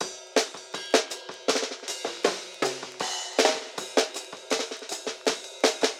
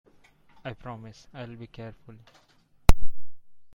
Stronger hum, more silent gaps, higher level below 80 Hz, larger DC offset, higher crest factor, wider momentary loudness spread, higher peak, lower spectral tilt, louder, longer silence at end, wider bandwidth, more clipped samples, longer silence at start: neither; neither; second, -82 dBFS vs -32 dBFS; neither; about the same, 22 dB vs 22 dB; second, 9 LU vs 23 LU; second, -6 dBFS vs -2 dBFS; second, -0.5 dB/octave vs -5.5 dB/octave; first, -28 LUFS vs -34 LUFS; second, 0 s vs 0.35 s; about the same, 17 kHz vs 16 kHz; neither; second, 0 s vs 0.65 s